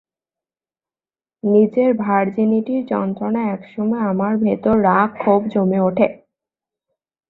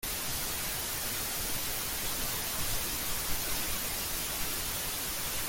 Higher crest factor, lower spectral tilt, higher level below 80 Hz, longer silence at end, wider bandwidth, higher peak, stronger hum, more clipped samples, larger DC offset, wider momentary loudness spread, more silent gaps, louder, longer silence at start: about the same, 16 dB vs 14 dB; first, -11 dB/octave vs -1 dB/octave; second, -56 dBFS vs -46 dBFS; first, 1.15 s vs 0 s; second, 4.1 kHz vs 17 kHz; first, -2 dBFS vs -18 dBFS; neither; neither; neither; first, 7 LU vs 1 LU; neither; first, -18 LUFS vs -32 LUFS; first, 1.45 s vs 0 s